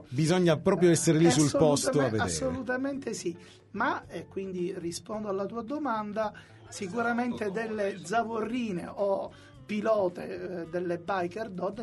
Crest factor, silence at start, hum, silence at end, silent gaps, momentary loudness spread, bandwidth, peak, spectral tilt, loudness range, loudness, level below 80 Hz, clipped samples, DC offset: 20 dB; 0 s; none; 0 s; none; 14 LU; 11.5 kHz; -10 dBFS; -5 dB/octave; 8 LU; -29 LUFS; -60 dBFS; under 0.1%; under 0.1%